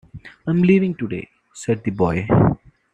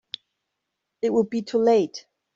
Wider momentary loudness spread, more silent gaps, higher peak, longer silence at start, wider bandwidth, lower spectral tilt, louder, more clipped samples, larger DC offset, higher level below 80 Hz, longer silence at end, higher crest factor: second, 15 LU vs 19 LU; neither; first, -2 dBFS vs -8 dBFS; second, 0.15 s vs 1.05 s; first, 9.2 kHz vs 7.6 kHz; first, -8 dB/octave vs -6 dB/octave; first, -19 LUFS vs -23 LUFS; neither; neither; first, -42 dBFS vs -68 dBFS; about the same, 0.4 s vs 0.35 s; about the same, 16 dB vs 16 dB